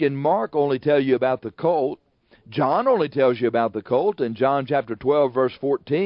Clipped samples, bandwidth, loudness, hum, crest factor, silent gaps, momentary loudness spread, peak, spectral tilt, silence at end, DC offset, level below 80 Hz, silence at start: under 0.1%; 5.6 kHz; -21 LUFS; none; 14 dB; none; 5 LU; -6 dBFS; -11.5 dB/octave; 0 s; under 0.1%; -64 dBFS; 0 s